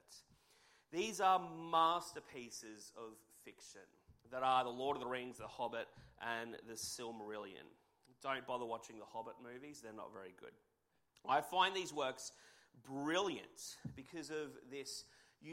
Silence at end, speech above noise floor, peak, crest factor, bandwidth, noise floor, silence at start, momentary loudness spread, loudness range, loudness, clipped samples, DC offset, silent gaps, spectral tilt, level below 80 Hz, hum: 0 s; 39 dB; -20 dBFS; 22 dB; 16 kHz; -81 dBFS; 0.1 s; 21 LU; 8 LU; -42 LUFS; under 0.1%; under 0.1%; none; -3 dB/octave; -78 dBFS; none